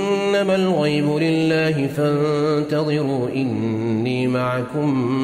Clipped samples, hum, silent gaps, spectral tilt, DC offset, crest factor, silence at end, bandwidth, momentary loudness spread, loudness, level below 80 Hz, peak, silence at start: under 0.1%; none; none; -7 dB/octave; under 0.1%; 12 dB; 0 s; 15 kHz; 4 LU; -20 LUFS; -58 dBFS; -6 dBFS; 0 s